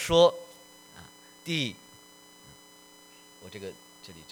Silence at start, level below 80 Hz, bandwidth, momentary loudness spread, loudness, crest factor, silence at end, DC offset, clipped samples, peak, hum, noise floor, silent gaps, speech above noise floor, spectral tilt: 0 s; -58 dBFS; over 20 kHz; 28 LU; -27 LUFS; 24 dB; 0.2 s; under 0.1%; under 0.1%; -8 dBFS; none; -54 dBFS; none; 29 dB; -4 dB/octave